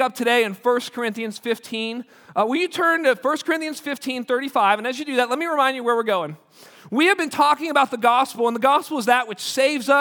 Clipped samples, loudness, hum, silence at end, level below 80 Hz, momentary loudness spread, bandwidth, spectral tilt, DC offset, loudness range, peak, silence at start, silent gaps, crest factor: under 0.1%; -21 LUFS; none; 0 s; -78 dBFS; 9 LU; over 20 kHz; -3 dB/octave; under 0.1%; 3 LU; -2 dBFS; 0 s; none; 18 dB